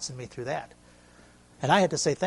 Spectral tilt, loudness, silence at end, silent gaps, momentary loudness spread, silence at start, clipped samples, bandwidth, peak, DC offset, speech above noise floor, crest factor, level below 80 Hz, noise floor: -4 dB/octave; -27 LUFS; 0 s; none; 14 LU; 0 s; under 0.1%; 11.5 kHz; -6 dBFS; under 0.1%; 28 dB; 22 dB; -62 dBFS; -55 dBFS